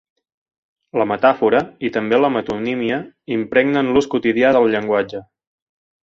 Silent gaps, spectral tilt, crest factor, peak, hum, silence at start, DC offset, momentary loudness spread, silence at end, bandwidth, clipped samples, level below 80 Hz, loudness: none; -6.5 dB/octave; 16 dB; -2 dBFS; none; 0.95 s; under 0.1%; 10 LU; 0.8 s; 7.6 kHz; under 0.1%; -54 dBFS; -18 LUFS